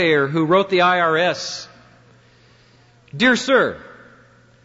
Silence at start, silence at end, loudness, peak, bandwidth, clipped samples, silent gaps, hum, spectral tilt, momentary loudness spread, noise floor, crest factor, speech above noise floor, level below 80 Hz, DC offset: 0 s; 0.75 s; -17 LUFS; -4 dBFS; 8 kHz; under 0.1%; none; none; -4.5 dB/octave; 15 LU; -52 dBFS; 16 dB; 35 dB; -60 dBFS; under 0.1%